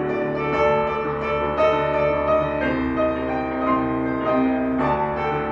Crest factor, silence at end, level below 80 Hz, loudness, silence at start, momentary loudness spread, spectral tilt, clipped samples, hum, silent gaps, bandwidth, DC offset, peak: 14 dB; 0 s; -40 dBFS; -21 LUFS; 0 s; 4 LU; -8 dB/octave; under 0.1%; none; none; 7 kHz; 0.1%; -8 dBFS